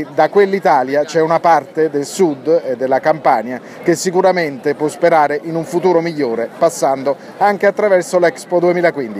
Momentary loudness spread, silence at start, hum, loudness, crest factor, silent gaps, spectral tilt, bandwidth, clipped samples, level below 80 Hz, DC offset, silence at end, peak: 6 LU; 0 s; none; -15 LUFS; 14 dB; none; -5 dB/octave; 15.5 kHz; under 0.1%; -68 dBFS; under 0.1%; 0 s; 0 dBFS